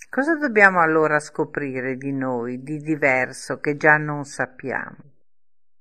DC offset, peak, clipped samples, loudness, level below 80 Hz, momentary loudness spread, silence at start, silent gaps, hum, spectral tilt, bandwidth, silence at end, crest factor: 0.3%; 0 dBFS; under 0.1%; -21 LUFS; -64 dBFS; 14 LU; 0.15 s; none; none; -6 dB/octave; 12.5 kHz; 0.85 s; 22 dB